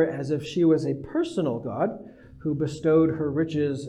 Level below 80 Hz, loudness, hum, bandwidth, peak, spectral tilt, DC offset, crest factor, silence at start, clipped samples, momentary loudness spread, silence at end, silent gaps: -58 dBFS; -25 LUFS; none; 10 kHz; -10 dBFS; -7.5 dB/octave; under 0.1%; 14 dB; 0 s; under 0.1%; 8 LU; 0 s; none